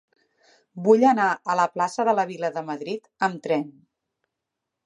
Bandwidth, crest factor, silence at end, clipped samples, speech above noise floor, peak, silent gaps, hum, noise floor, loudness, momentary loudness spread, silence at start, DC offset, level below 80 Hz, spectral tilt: 10.5 kHz; 20 dB; 1.15 s; under 0.1%; 61 dB; -4 dBFS; none; none; -84 dBFS; -23 LUFS; 14 LU; 0.75 s; under 0.1%; -80 dBFS; -5.5 dB/octave